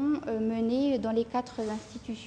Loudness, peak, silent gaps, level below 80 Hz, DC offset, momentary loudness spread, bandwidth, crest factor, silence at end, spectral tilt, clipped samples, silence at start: -30 LUFS; -18 dBFS; none; -58 dBFS; under 0.1%; 8 LU; 9.6 kHz; 12 dB; 0 s; -6.5 dB/octave; under 0.1%; 0 s